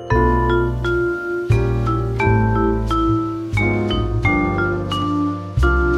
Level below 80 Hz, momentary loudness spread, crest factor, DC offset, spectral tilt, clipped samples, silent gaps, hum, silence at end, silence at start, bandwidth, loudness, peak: -24 dBFS; 5 LU; 14 dB; under 0.1%; -7.5 dB/octave; under 0.1%; none; none; 0 s; 0 s; 11 kHz; -19 LUFS; -4 dBFS